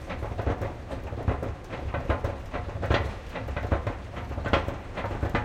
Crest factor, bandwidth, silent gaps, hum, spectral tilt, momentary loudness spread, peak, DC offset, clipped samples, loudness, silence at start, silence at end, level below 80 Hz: 24 dB; 13 kHz; none; none; -7 dB/octave; 9 LU; -6 dBFS; under 0.1%; under 0.1%; -31 LUFS; 0 s; 0 s; -36 dBFS